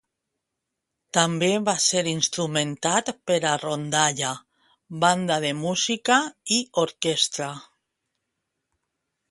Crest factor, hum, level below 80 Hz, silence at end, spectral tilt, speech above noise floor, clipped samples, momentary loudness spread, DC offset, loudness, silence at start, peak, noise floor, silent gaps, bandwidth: 22 dB; none; -68 dBFS; 1.7 s; -2.5 dB/octave; 59 dB; under 0.1%; 7 LU; under 0.1%; -23 LUFS; 1.15 s; -2 dBFS; -83 dBFS; none; 11.5 kHz